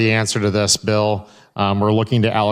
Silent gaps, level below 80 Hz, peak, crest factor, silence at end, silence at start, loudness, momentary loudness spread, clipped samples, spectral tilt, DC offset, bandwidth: none; -52 dBFS; -2 dBFS; 14 dB; 0 s; 0 s; -17 LUFS; 6 LU; under 0.1%; -4.5 dB/octave; under 0.1%; 14.5 kHz